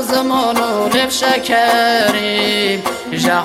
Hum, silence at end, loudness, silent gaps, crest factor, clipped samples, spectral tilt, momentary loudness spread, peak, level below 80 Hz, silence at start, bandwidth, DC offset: none; 0 s; -14 LUFS; none; 14 dB; under 0.1%; -3 dB/octave; 5 LU; 0 dBFS; -52 dBFS; 0 s; 16.5 kHz; under 0.1%